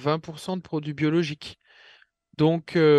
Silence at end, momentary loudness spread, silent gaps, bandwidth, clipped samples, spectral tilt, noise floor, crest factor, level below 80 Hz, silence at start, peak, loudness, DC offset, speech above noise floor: 0 s; 16 LU; none; 12 kHz; under 0.1%; -7 dB/octave; -56 dBFS; 16 dB; -64 dBFS; 0 s; -8 dBFS; -26 LUFS; under 0.1%; 33 dB